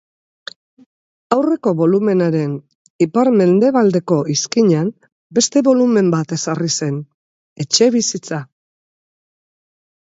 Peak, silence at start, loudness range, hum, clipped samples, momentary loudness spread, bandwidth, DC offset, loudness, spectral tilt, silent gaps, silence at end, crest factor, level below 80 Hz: 0 dBFS; 1.3 s; 5 LU; none; under 0.1%; 14 LU; 8 kHz; under 0.1%; -16 LUFS; -5 dB/octave; 2.75-2.99 s, 5.12-5.30 s, 7.14-7.56 s; 1.75 s; 16 dB; -64 dBFS